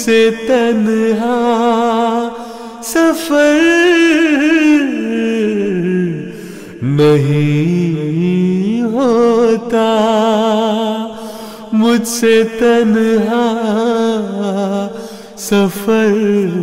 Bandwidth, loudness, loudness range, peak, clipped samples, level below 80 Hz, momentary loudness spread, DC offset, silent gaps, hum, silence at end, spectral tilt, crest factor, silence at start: 16 kHz; -13 LUFS; 3 LU; -4 dBFS; under 0.1%; -50 dBFS; 12 LU; under 0.1%; none; none; 0 s; -5.5 dB/octave; 8 dB; 0 s